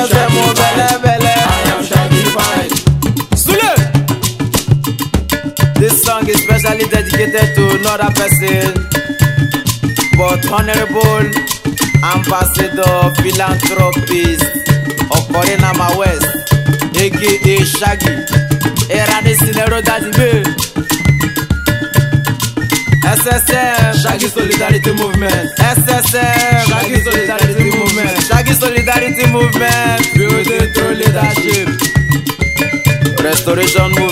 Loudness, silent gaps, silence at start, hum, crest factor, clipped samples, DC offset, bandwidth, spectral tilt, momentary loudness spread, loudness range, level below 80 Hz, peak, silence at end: -11 LUFS; none; 0 s; none; 12 dB; 0.4%; under 0.1%; 16.5 kHz; -4.5 dB/octave; 4 LU; 2 LU; -26 dBFS; 0 dBFS; 0 s